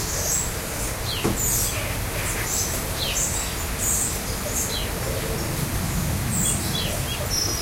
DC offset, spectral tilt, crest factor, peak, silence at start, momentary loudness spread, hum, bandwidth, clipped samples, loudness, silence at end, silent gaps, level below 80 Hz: under 0.1%; -3 dB/octave; 16 dB; -8 dBFS; 0 s; 5 LU; none; 16 kHz; under 0.1%; -24 LUFS; 0 s; none; -34 dBFS